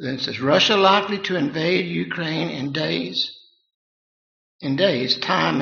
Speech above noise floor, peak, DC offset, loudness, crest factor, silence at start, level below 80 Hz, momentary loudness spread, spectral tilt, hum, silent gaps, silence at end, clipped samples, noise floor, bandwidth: over 69 dB; -2 dBFS; under 0.1%; -20 LUFS; 20 dB; 0 s; -64 dBFS; 9 LU; -2.5 dB/octave; none; 3.74-4.59 s; 0 s; under 0.1%; under -90 dBFS; 7.2 kHz